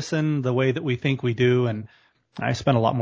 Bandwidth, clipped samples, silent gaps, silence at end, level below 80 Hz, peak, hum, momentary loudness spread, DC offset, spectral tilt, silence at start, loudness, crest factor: 8 kHz; under 0.1%; none; 0 s; -54 dBFS; -6 dBFS; none; 8 LU; under 0.1%; -7 dB/octave; 0 s; -23 LUFS; 18 dB